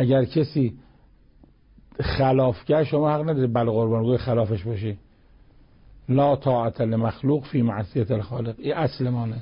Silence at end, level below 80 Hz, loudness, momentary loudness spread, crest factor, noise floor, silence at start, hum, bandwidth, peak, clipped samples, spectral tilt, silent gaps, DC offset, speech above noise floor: 0 s; -46 dBFS; -23 LUFS; 9 LU; 12 dB; -54 dBFS; 0 s; none; 5.4 kHz; -10 dBFS; under 0.1%; -12.5 dB/octave; none; under 0.1%; 32 dB